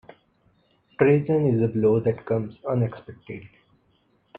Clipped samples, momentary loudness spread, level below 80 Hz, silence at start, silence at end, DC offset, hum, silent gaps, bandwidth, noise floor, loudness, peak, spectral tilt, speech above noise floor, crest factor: under 0.1%; 20 LU; -60 dBFS; 1 s; 0.95 s; under 0.1%; none; none; 4.2 kHz; -65 dBFS; -23 LUFS; -4 dBFS; -11.5 dB/octave; 43 dB; 20 dB